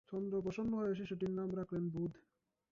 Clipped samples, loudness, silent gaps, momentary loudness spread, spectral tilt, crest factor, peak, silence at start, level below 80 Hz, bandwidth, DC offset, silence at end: under 0.1%; -40 LUFS; none; 3 LU; -8.5 dB/octave; 12 dB; -28 dBFS; 0.1 s; -68 dBFS; 7.2 kHz; under 0.1%; 0.5 s